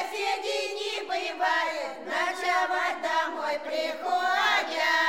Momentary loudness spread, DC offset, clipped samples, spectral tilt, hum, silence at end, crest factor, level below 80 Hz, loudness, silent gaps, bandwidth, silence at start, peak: 7 LU; 0.2%; under 0.1%; 0 dB/octave; none; 0 s; 16 dB; -80 dBFS; -27 LUFS; none; 17 kHz; 0 s; -12 dBFS